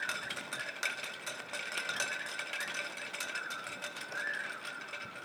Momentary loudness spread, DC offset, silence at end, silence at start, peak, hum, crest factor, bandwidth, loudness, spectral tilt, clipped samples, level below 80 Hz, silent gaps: 6 LU; under 0.1%; 0 s; 0 s; -18 dBFS; none; 22 dB; over 20 kHz; -38 LUFS; -0.5 dB/octave; under 0.1%; -86 dBFS; none